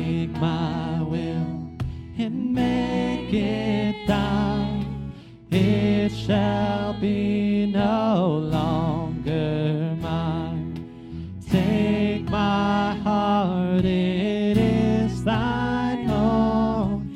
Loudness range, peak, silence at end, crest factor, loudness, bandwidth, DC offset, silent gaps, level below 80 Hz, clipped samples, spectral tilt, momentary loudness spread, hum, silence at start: 4 LU; -8 dBFS; 0 s; 16 dB; -23 LUFS; 11 kHz; under 0.1%; none; -40 dBFS; under 0.1%; -8 dB/octave; 9 LU; none; 0 s